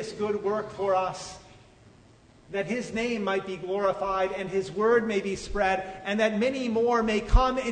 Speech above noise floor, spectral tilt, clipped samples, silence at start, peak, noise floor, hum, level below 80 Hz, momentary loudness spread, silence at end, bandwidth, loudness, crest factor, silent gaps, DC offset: 29 dB; -5.5 dB/octave; under 0.1%; 0 s; -6 dBFS; -55 dBFS; none; -36 dBFS; 8 LU; 0 s; 9.6 kHz; -27 LUFS; 20 dB; none; under 0.1%